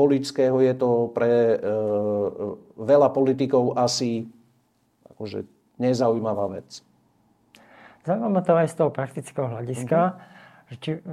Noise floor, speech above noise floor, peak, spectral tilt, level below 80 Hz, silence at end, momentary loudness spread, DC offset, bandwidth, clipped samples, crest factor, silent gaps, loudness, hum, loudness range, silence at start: -66 dBFS; 43 dB; -6 dBFS; -6.5 dB/octave; -68 dBFS; 0 s; 15 LU; under 0.1%; 13 kHz; under 0.1%; 18 dB; none; -23 LUFS; none; 7 LU; 0 s